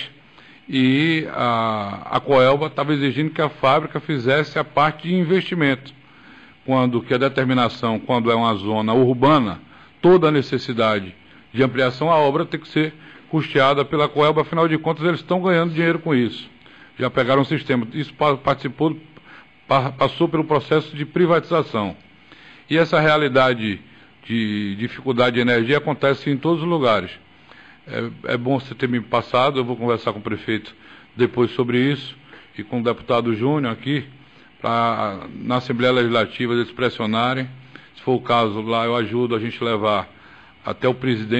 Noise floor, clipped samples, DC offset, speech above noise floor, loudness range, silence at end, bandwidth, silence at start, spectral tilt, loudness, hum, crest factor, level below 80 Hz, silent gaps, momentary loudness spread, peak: -48 dBFS; under 0.1%; under 0.1%; 29 dB; 4 LU; 0 s; 8.4 kHz; 0 s; -7.5 dB/octave; -20 LUFS; none; 14 dB; -56 dBFS; none; 10 LU; -6 dBFS